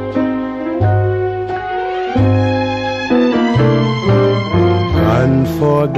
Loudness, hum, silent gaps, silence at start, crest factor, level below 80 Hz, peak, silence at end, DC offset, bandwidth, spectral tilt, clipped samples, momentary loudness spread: -14 LUFS; none; none; 0 s; 12 dB; -34 dBFS; -2 dBFS; 0 s; under 0.1%; 13.5 kHz; -8 dB/octave; under 0.1%; 7 LU